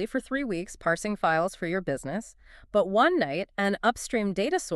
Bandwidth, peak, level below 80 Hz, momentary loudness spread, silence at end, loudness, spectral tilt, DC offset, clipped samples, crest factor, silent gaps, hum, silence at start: 13.5 kHz; -8 dBFS; -54 dBFS; 9 LU; 0 s; -27 LUFS; -4.5 dB/octave; under 0.1%; under 0.1%; 18 dB; none; none; 0 s